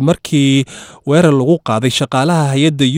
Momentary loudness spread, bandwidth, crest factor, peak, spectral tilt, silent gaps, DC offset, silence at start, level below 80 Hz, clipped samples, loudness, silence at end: 4 LU; 16 kHz; 12 dB; 0 dBFS; -6 dB/octave; none; under 0.1%; 0 s; -50 dBFS; under 0.1%; -13 LUFS; 0 s